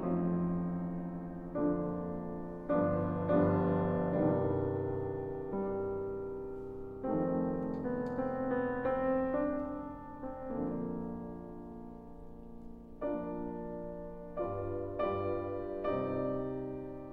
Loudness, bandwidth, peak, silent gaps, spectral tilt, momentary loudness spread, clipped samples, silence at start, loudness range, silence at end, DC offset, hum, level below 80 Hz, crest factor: -36 LUFS; 4.5 kHz; -16 dBFS; none; -11 dB/octave; 14 LU; under 0.1%; 0 s; 10 LU; 0 s; under 0.1%; none; -54 dBFS; 18 dB